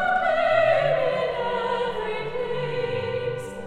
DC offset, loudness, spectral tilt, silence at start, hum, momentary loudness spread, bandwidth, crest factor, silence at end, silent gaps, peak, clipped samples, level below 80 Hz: under 0.1%; -24 LUFS; -5.5 dB/octave; 0 s; none; 9 LU; 11.5 kHz; 16 dB; 0 s; none; -8 dBFS; under 0.1%; -52 dBFS